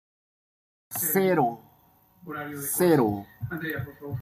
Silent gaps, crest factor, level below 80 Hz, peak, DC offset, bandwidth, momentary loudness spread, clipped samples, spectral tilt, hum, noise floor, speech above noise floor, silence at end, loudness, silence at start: none; 18 dB; -62 dBFS; -10 dBFS; under 0.1%; 16 kHz; 15 LU; under 0.1%; -5.5 dB/octave; none; -61 dBFS; 35 dB; 0 s; -26 LUFS; 0.9 s